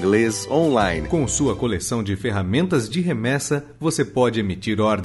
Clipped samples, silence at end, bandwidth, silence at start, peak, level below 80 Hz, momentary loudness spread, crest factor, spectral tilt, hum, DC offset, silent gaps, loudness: under 0.1%; 0 s; 12 kHz; 0 s; -4 dBFS; -42 dBFS; 5 LU; 16 dB; -5 dB/octave; none; under 0.1%; none; -21 LUFS